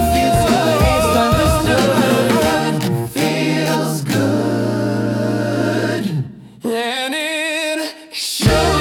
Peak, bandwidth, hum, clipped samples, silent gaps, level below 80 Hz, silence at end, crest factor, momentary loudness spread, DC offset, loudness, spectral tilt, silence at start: -2 dBFS; 18 kHz; none; under 0.1%; none; -32 dBFS; 0 s; 14 dB; 7 LU; under 0.1%; -16 LUFS; -5 dB/octave; 0 s